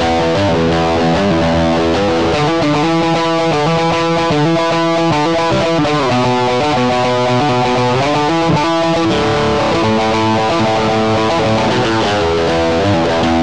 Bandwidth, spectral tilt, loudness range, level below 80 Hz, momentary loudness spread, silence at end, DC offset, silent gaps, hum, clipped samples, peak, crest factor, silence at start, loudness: 10.5 kHz; -5.5 dB/octave; 0 LU; -34 dBFS; 1 LU; 0 s; 2%; none; none; under 0.1%; -4 dBFS; 8 dB; 0 s; -13 LUFS